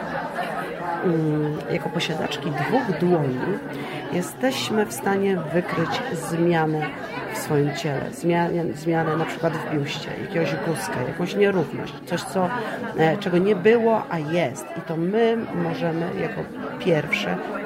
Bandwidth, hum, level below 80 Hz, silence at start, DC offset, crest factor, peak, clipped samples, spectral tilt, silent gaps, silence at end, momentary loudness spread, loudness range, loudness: 16 kHz; none; -58 dBFS; 0 s; under 0.1%; 18 dB; -6 dBFS; under 0.1%; -6 dB/octave; none; 0 s; 8 LU; 3 LU; -24 LUFS